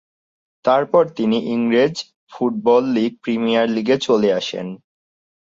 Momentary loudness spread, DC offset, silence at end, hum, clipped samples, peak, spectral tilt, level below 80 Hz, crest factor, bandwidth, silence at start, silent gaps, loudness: 10 LU; under 0.1%; 0.8 s; none; under 0.1%; -2 dBFS; -5.5 dB/octave; -64 dBFS; 16 dB; 7.8 kHz; 0.65 s; 2.16-2.27 s; -18 LUFS